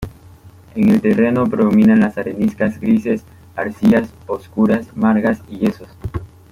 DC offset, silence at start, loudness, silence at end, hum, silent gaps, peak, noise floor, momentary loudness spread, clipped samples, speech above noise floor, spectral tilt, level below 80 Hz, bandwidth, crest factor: under 0.1%; 0 s; -16 LUFS; 0.25 s; none; none; -2 dBFS; -42 dBFS; 16 LU; under 0.1%; 27 dB; -8.5 dB/octave; -44 dBFS; 11 kHz; 14 dB